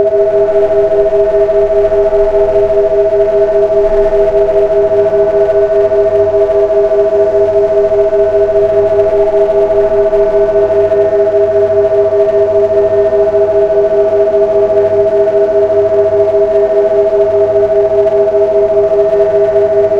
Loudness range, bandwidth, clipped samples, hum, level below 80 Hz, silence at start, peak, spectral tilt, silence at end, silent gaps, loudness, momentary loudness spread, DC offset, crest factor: 0 LU; 6.4 kHz; under 0.1%; none; -32 dBFS; 0 s; 0 dBFS; -7.5 dB/octave; 0 s; none; -9 LUFS; 0 LU; under 0.1%; 8 dB